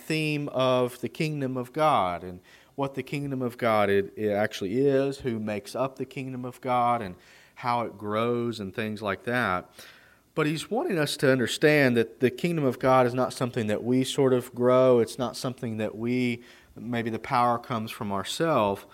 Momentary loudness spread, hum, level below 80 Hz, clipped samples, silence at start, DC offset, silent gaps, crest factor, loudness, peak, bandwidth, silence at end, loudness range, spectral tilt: 11 LU; none; -64 dBFS; under 0.1%; 0 s; under 0.1%; none; 18 dB; -26 LUFS; -8 dBFS; 16 kHz; 0.1 s; 5 LU; -5.5 dB/octave